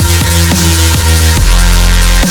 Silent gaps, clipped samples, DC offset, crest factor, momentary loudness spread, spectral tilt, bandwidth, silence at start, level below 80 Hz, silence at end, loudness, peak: none; under 0.1%; under 0.1%; 6 dB; 1 LU; -3.5 dB/octave; over 20 kHz; 0 s; -10 dBFS; 0 s; -8 LUFS; 0 dBFS